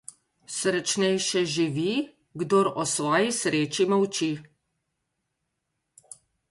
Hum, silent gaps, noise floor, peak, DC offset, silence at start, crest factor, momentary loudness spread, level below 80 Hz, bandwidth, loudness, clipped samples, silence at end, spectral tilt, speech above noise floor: none; none; -80 dBFS; -10 dBFS; under 0.1%; 0.5 s; 18 dB; 11 LU; -70 dBFS; 11.5 kHz; -25 LUFS; under 0.1%; 2.05 s; -3.5 dB/octave; 55 dB